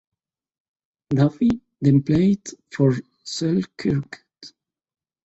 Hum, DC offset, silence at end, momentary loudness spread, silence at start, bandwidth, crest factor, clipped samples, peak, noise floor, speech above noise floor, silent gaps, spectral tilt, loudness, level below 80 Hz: none; under 0.1%; 0.75 s; 12 LU; 1.1 s; 8.2 kHz; 18 dB; under 0.1%; -4 dBFS; -50 dBFS; 31 dB; none; -7 dB/octave; -21 LUFS; -52 dBFS